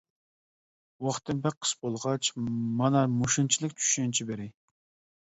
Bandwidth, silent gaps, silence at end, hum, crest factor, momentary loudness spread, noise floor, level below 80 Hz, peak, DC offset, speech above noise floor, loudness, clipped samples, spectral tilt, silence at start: 8.2 kHz; 1.57-1.61 s; 0.7 s; none; 20 dB; 9 LU; under -90 dBFS; -64 dBFS; -10 dBFS; under 0.1%; over 61 dB; -28 LUFS; under 0.1%; -4 dB/octave; 1 s